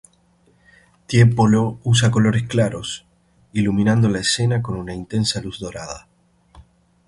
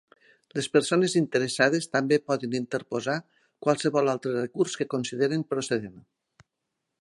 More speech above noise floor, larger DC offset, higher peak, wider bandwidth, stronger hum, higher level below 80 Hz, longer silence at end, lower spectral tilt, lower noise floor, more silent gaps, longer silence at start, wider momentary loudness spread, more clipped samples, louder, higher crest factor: second, 40 dB vs 57 dB; neither; first, -2 dBFS vs -6 dBFS; about the same, 11.5 kHz vs 11.5 kHz; neither; first, -46 dBFS vs -72 dBFS; second, 0.45 s vs 1 s; about the same, -5.5 dB/octave vs -4.5 dB/octave; second, -58 dBFS vs -83 dBFS; neither; first, 1.1 s vs 0.55 s; first, 15 LU vs 8 LU; neither; first, -19 LUFS vs -26 LUFS; about the same, 18 dB vs 20 dB